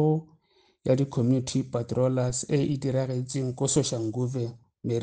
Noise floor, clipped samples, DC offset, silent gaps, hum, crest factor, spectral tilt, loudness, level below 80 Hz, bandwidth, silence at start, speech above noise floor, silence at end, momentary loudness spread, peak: -65 dBFS; under 0.1%; under 0.1%; none; none; 16 dB; -6 dB/octave; -27 LUFS; -58 dBFS; 9.8 kHz; 0 s; 39 dB; 0 s; 6 LU; -10 dBFS